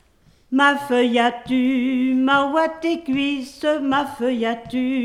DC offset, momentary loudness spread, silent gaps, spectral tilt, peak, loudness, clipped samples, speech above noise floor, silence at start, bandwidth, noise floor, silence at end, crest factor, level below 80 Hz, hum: under 0.1%; 7 LU; none; -4.5 dB/octave; -2 dBFS; -20 LUFS; under 0.1%; 36 dB; 0.5 s; 12.5 kHz; -56 dBFS; 0 s; 16 dB; -58 dBFS; none